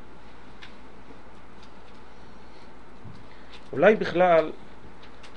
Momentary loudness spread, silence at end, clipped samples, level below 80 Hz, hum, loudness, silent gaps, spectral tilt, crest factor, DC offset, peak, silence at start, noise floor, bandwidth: 27 LU; 0.85 s; under 0.1%; -56 dBFS; none; -22 LUFS; none; -6.5 dB/octave; 24 dB; 2%; -6 dBFS; 0.6 s; -49 dBFS; 9 kHz